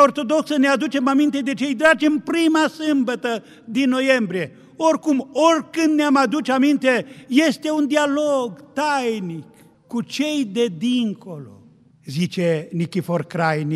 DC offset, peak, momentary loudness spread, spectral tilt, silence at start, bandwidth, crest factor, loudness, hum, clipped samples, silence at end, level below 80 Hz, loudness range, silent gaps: under 0.1%; -2 dBFS; 10 LU; -5 dB/octave; 0 s; 13.5 kHz; 18 dB; -20 LUFS; none; under 0.1%; 0 s; -68 dBFS; 5 LU; none